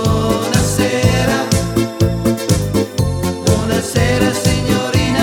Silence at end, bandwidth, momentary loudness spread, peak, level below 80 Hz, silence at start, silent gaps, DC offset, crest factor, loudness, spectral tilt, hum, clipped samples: 0 s; 18.5 kHz; 4 LU; 0 dBFS; -28 dBFS; 0 s; none; under 0.1%; 14 dB; -15 LUFS; -5 dB/octave; none; under 0.1%